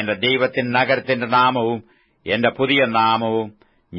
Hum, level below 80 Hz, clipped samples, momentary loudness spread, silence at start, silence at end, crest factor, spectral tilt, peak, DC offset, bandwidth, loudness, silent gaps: none; -60 dBFS; under 0.1%; 9 LU; 0 s; 0 s; 16 dB; -8 dB/octave; -4 dBFS; under 0.1%; 5.8 kHz; -18 LUFS; none